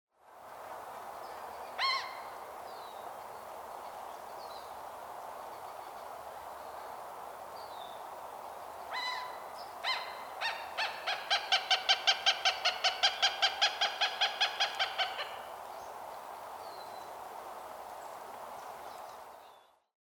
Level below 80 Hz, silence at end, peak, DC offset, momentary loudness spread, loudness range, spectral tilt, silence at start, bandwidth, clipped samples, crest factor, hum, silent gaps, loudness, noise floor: -76 dBFS; 0.45 s; -12 dBFS; under 0.1%; 17 LU; 16 LU; 1 dB/octave; 0.25 s; over 20 kHz; under 0.1%; 26 dB; none; none; -33 LUFS; -60 dBFS